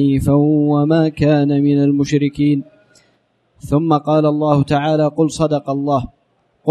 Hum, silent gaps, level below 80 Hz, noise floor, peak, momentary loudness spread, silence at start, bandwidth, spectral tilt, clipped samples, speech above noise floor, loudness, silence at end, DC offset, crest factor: none; none; -42 dBFS; -60 dBFS; 0 dBFS; 5 LU; 0 s; 12 kHz; -8 dB/octave; under 0.1%; 46 dB; -15 LUFS; 0 s; under 0.1%; 14 dB